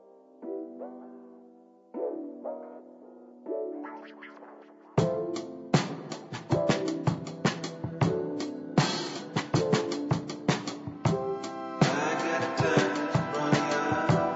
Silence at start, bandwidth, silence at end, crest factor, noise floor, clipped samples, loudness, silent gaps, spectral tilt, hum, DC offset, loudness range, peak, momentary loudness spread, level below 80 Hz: 0.4 s; 8 kHz; 0 s; 20 dB; -56 dBFS; under 0.1%; -30 LUFS; none; -5.5 dB/octave; none; under 0.1%; 12 LU; -10 dBFS; 19 LU; -62 dBFS